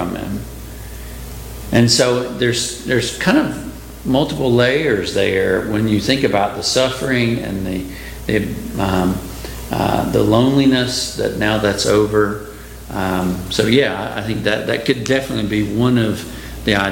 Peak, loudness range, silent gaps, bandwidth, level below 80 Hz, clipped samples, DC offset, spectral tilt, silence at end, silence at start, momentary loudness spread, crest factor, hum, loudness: 0 dBFS; 3 LU; none; 17 kHz; -36 dBFS; under 0.1%; under 0.1%; -5 dB/octave; 0 s; 0 s; 15 LU; 16 dB; none; -17 LUFS